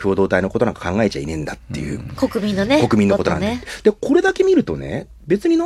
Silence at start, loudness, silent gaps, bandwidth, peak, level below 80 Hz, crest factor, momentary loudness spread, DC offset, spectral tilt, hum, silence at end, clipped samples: 0 s; -18 LUFS; none; 13.5 kHz; -2 dBFS; -42 dBFS; 16 dB; 12 LU; under 0.1%; -6.5 dB/octave; none; 0 s; under 0.1%